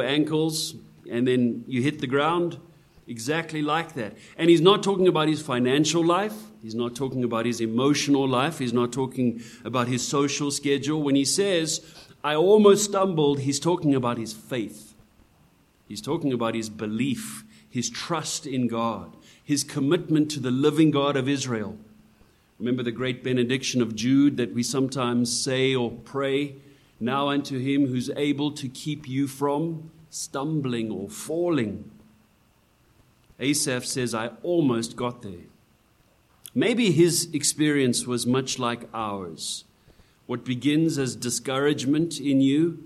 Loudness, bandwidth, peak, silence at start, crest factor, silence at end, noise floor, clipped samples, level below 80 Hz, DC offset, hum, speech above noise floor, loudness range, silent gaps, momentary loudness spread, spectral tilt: -24 LUFS; 13.5 kHz; -4 dBFS; 0 s; 22 dB; 0 s; -62 dBFS; under 0.1%; -64 dBFS; under 0.1%; none; 38 dB; 7 LU; none; 11 LU; -4.5 dB/octave